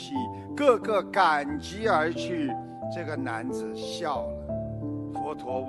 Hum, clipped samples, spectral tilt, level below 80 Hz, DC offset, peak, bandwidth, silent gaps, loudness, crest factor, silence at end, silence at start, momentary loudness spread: none; under 0.1%; -5.5 dB/octave; -52 dBFS; under 0.1%; -6 dBFS; 12 kHz; none; -28 LUFS; 22 dB; 0 s; 0 s; 11 LU